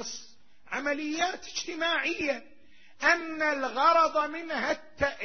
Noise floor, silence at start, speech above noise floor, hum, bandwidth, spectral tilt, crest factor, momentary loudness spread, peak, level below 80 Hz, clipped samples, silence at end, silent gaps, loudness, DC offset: -57 dBFS; 0 s; 29 dB; none; 6.6 kHz; -2 dB/octave; 20 dB; 11 LU; -10 dBFS; -60 dBFS; under 0.1%; 0 s; none; -28 LUFS; 0.4%